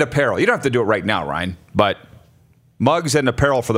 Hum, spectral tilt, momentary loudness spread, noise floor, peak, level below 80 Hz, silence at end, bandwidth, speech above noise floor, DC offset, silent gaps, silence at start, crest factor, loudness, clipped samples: none; -5 dB/octave; 7 LU; -54 dBFS; 0 dBFS; -44 dBFS; 0 s; 16 kHz; 36 dB; under 0.1%; none; 0 s; 18 dB; -18 LUFS; under 0.1%